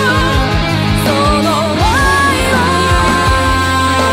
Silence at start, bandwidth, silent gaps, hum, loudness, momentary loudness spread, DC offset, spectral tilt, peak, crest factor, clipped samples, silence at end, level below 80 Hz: 0 s; 16 kHz; none; none; -11 LUFS; 3 LU; under 0.1%; -4.5 dB/octave; 0 dBFS; 10 dB; under 0.1%; 0 s; -22 dBFS